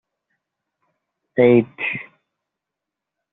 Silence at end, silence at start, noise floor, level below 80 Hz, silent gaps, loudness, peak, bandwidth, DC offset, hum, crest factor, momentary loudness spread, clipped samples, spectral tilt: 1.3 s; 1.35 s; -84 dBFS; -64 dBFS; none; -18 LUFS; -2 dBFS; 4 kHz; under 0.1%; none; 20 dB; 13 LU; under 0.1%; -6 dB/octave